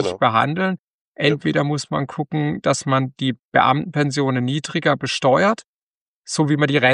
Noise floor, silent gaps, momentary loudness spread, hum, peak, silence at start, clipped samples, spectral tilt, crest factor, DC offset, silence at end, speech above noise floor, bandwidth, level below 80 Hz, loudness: under -90 dBFS; 0.79-1.15 s, 3.43-3.52 s, 5.64-6.22 s; 8 LU; none; -2 dBFS; 0 s; under 0.1%; -5.5 dB/octave; 18 dB; under 0.1%; 0 s; over 71 dB; 11 kHz; -60 dBFS; -20 LUFS